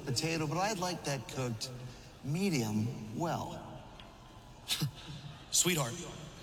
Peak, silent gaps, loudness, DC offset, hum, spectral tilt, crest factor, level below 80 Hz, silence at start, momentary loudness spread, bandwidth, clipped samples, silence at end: -16 dBFS; none; -34 LUFS; under 0.1%; none; -3.5 dB/octave; 22 dB; -60 dBFS; 0 s; 19 LU; 19 kHz; under 0.1%; 0 s